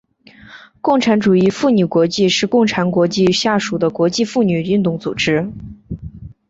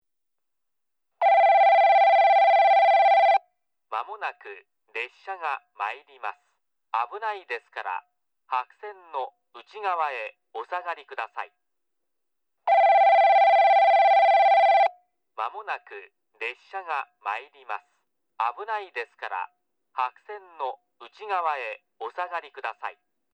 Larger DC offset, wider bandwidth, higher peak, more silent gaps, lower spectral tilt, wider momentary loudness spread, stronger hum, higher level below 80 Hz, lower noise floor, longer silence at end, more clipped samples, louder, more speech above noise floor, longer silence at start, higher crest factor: neither; first, 8 kHz vs 5.8 kHz; first, -2 dBFS vs -10 dBFS; neither; first, -5.5 dB/octave vs 0 dB/octave; second, 15 LU vs 20 LU; neither; first, -46 dBFS vs under -90 dBFS; second, -44 dBFS vs -84 dBFS; second, 0.15 s vs 0.45 s; neither; first, -15 LUFS vs -22 LUFS; second, 29 dB vs 51 dB; second, 0.5 s vs 1.2 s; about the same, 14 dB vs 14 dB